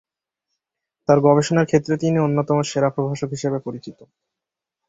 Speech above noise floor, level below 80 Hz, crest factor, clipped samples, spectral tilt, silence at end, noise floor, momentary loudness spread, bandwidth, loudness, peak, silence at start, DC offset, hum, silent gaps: 67 dB; -58 dBFS; 20 dB; under 0.1%; -6.5 dB/octave; 0.85 s; -86 dBFS; 12 LU; 8 kHz; -19 LUFS; -2 dBFS; 1.1 s; under 0.1%; none; none